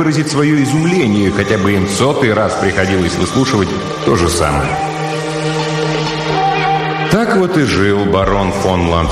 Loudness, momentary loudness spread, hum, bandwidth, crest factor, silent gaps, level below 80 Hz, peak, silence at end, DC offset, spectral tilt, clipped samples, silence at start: -14 LUFS; 5 LU; none; 13.5 kHz; 12 dB; none; -32 dBFS; 0 dBFS; 0 s; under 0.1%; -5.5 dB/octave; under 0.1%; 0 s